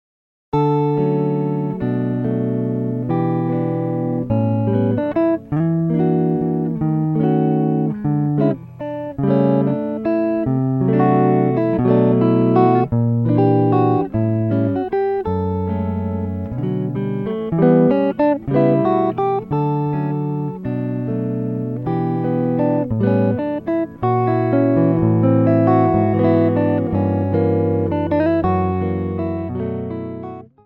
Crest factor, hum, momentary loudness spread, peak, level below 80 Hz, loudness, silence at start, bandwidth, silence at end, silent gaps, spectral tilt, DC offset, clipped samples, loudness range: 16 dB; none; 8 LU; -2 dBFS; -48 dBFS; -18 LUFS; 0.55 s; 5.2 kHz; 0.2 s; none; -11.5 dB/octave; under 0.1%; under 0.1%; 5 LU